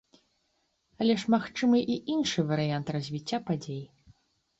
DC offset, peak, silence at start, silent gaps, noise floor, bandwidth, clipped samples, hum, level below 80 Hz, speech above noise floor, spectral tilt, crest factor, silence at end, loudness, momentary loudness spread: under 0.1%; -12 dBFS; 1 s; none; -75 dBFS; 8 kHz; under 0.1%; none; -66 dBFS; 47 dB; -6 dB/octave; 18 dB; 0.75 s; -29 LUFS; 9 LU